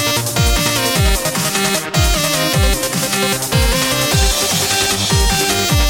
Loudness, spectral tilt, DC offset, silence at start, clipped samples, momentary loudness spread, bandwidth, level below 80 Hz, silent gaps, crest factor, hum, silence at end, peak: -14 LUFS; -3 dB/octave; under 0.1%; 0 s; under 0.1%; 2 LU; 17 kHz; -22 dBFS; none; 12 dB; none; 0 s; -2 dBFS